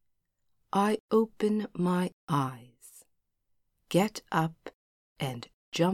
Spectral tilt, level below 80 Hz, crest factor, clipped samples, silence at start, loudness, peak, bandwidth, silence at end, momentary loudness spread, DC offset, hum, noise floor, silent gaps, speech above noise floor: -6 dB/octave; -70 dBFS; 20 dB; under 0.1%; 0.75 s; -30 LUFS; -12 dBFS; 16 kHz; 0 s; 11 LU; under 0.1%; none; -76 dBFS; 1.00-1.08 s, 2.13-2.27 s, 4.75-5.16 s, 5.54-5.72 s; 47 dB